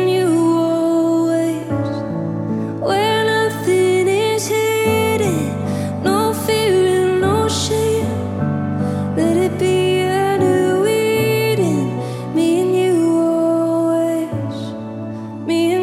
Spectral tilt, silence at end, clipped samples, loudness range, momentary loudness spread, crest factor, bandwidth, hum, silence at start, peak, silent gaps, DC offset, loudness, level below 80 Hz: -5.5 dB/octave; 0 s; under 0.1%; 1 LU; 7 LU; 12 dB; 15.5 kHz; none; 0 s; -4 dBFS; none; under 0.1%; -17 LUFS; -52 dBFS